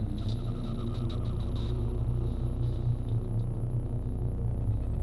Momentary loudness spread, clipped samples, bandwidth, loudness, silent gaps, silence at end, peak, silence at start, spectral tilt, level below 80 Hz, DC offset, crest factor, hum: 3 LU; under 0.1%; 11.5 kHz; -33 LUFS; none; 0 s; -18 dBFS; 0 s; -9 dB/octave; -34 dBFS; under 0.1%; 12 dB; none